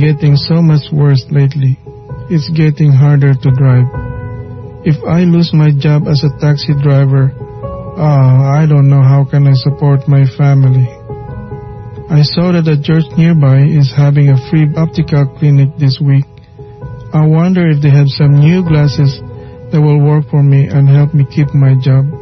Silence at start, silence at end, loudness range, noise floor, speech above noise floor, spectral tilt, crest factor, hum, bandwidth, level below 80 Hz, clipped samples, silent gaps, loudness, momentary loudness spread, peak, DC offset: 0 s; 0 s; 2 LU; -32 dBFS; 24 dB; -9 dB/octave; 8 dB; none; 6.2 kHz; -38 dBFS; under 0.1%; none; -9 LUFS; 16 LU; 0 dBFS; under 0.1%